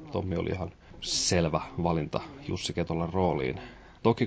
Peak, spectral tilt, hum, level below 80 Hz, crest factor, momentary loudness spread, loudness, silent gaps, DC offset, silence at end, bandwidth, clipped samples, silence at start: -10 dBFS; -4.5 dB/octave; none; -46 dBFS; 20 dB; 12 LU; -30 LUFS; none; under 0.1%; 0 s; 8 kHz; under 0.1%; 0 s